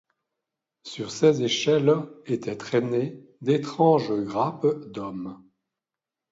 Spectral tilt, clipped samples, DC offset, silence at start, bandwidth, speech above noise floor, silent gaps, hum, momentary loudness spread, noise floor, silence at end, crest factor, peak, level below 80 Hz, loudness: -6 dB/octave; under 0.1%; under 0.1%; 0.85 s; 7.8 kHz; 65 dB; none; none; 14 LU; -89 dBFS; 0.95 s; 18 dB; -6 dBFS; -68 dBFS; -24 LUFS